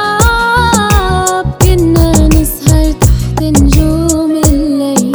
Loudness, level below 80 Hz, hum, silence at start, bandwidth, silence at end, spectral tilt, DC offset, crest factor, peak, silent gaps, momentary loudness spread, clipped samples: -9 LUFS; -14 dBFS; none; 0 s; over 20 kHz; 0 s; -5 dB/octave; under 0.1%; 8 dB; 0 dBFS; none; 3 LU; 1%